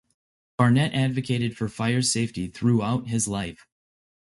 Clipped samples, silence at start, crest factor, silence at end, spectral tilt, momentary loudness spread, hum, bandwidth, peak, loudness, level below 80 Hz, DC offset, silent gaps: under 0.1%; 0.6 s; 20 dB; 0.85 s; -5 dB/octave; 9 LU; none; 11.5 kHz; -6 dBFS; -24 LUFS; -54 dBFS; under 0.1%; none